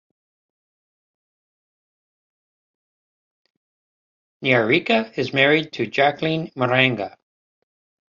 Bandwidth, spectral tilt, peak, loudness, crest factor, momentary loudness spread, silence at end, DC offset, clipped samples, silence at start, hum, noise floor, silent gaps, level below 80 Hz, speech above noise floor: 7.4 kHz; -6.5 dB/octave; -2 dBFS; -19 LUFS; 22 dB; 8 LU; 1 s; under 0.1%; under 0.1%; 4.4 s; none; under -90 dBFS; none; -64 dBFS; over 70 dB